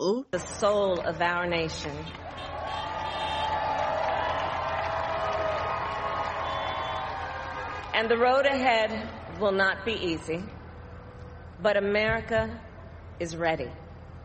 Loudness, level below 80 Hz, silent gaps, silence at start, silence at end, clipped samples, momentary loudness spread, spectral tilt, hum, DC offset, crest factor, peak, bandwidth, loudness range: -28 LUFS; -50 dBFS; none; 0 s; 0 s; under 0.1%; 18 LU; -4.5 dB/octave; none; under 0.1%; 18 dB; -10 dBFS; 8.4 kHz; 4 LU